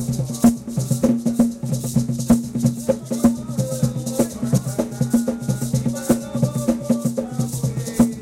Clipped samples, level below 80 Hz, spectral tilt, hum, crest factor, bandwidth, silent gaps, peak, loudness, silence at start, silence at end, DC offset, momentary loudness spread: under 0.1%; -44 dBFS; -6.5 dB/octave; none; 18 dB; 16 kHz; none; -2 dBFS; -21 LUFS; 0 s; 0 s; under 0.1%; 6 LU